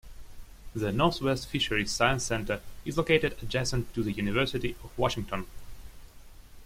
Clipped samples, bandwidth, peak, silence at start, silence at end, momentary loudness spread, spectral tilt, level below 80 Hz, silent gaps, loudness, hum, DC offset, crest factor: under 0.1%; 16.5 kHz; -8 dBFS; 0.05 s; 0 s; 9 LU; -4.5 dB/octave; -44 dBFS; none; -29 LUFS; none; under 0.1%; 22 dB